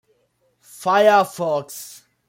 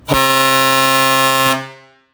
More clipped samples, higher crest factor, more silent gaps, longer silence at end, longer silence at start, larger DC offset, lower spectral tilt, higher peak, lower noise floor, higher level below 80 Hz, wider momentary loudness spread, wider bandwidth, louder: neither; about the same, 18 dB vs 14 dB; neither; about the same, 0.35 s vs 0.4 s; first, 0.8 s vs 0.05 s; neither; first, -4 dB/octave vs -2.5 dB/octave; second, -4 dBFS vs 0 dBFS; first, -65 dBFS vs -38 dBFS; second, -72 dBFS vs -44 dBFS; first, 20 LU vs 4 LU; second, 16.5 kHz vs over 20 kHz; second, -18 LUFS vs -12 LUFS